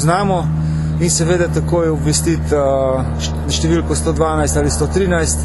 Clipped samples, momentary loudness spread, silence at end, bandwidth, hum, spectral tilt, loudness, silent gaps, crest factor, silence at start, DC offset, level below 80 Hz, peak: under 0.1%; 4 LU; 0 s; 12.5 kHz; none; -5 dB/octave; -16 LUFS; none; 14 dB; 0 s; under 0.1%; -24 dBFS; 0 dBFS